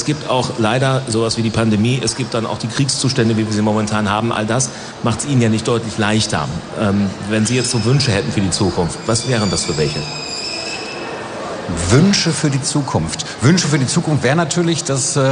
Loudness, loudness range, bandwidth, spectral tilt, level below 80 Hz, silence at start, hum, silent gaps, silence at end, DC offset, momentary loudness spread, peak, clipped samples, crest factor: -17 LUFS; 2 LU; 10.5 kHz; -4.5 dB/octave; -42 dBFS; 0 s; none; none; 0 s; under 0.1%; 8 LU; -2 dBFS; under 0.1%; 14 dB